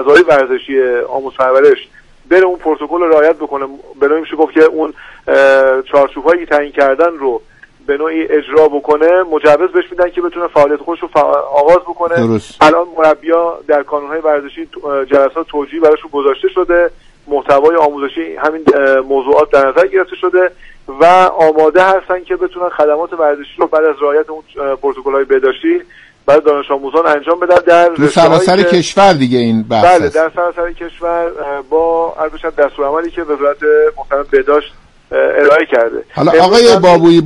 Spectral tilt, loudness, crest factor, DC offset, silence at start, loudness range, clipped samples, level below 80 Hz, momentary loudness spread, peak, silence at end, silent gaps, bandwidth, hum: -5.5 dB/octave; -11 LUFS; 10 dB; under 0.1%; 0 s; 4 LU; 0.2%; -42 dBFS; 10 LU; 0 dBFS; 0 s; none; 11.5 kHz; none